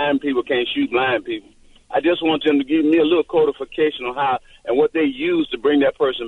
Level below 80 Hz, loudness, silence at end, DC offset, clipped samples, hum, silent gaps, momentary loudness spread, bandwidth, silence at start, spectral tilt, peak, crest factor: -52 dBFS; -19 LUFS; 0 s; under 0.1%; under 0.1%; none; none; 6 LU; 4.2 kHz; 0 s; -6.5 dB/octave; -6 dBFS; 14 dB